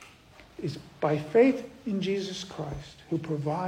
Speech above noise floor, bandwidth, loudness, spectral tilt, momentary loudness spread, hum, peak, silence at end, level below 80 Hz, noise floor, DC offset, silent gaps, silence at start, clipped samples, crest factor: 25 dB; 10.5 kHz; -29 LUFS; -6.5 dB/octave; 15 LU; none; -10 dBFS; 0 s; -56 dBFS; -54 dBFS; under 0.1%; none; 0 s; under 0.1%; 20 dB